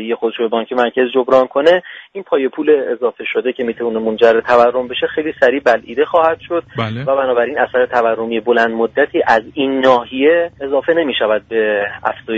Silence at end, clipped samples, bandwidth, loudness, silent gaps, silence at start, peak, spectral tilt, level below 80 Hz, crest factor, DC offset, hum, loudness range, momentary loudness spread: 0 s; under 0.1%; 7.6 kHz; -15 LUFS; none; 0 s; 0 dBFS; -6 dB/octave; -54 dBFS; 14 dB; under 0.1%; none; 1 LU; 7 LU